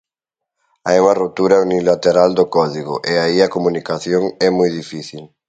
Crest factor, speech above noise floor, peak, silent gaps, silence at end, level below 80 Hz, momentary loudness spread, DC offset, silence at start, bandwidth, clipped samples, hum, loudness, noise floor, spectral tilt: 16 dB; 68 dB; 0 dBFS; none; 0.25 s; -54 dBFS; 11 LU; under 0.1%; 0.85 s; 9 kHz; under 0.1%; none; -15 LUFS; -83 dBFS; -5.5 dB/octave